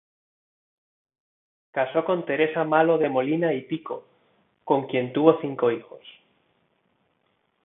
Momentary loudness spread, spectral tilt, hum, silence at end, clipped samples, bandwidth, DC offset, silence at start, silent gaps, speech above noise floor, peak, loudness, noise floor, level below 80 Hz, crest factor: 13 LU; -10.5 dB/octave; none; 1.55 s; under 0.1%; 3.9 kHz; under 0.1%; 1.75 s; none; 47 dB; -4 dBFS; -24 LUFS; -70 dBFS; -76 dBFS; 24 dB